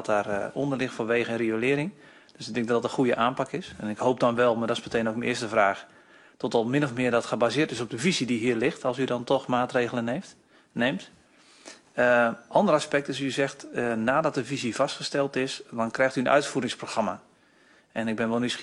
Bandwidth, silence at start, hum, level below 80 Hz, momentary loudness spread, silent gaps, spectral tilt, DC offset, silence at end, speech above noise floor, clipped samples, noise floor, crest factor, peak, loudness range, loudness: 11.5 kHz; 0 s; none; -66 dBFS; 9 LU; none; -5 dB/octave; under 0.1%; 0 s; 33 dB; under 0.1%; -59 dBFS; 20 dB; -8 dBFS; 2 LU; -26 LUFS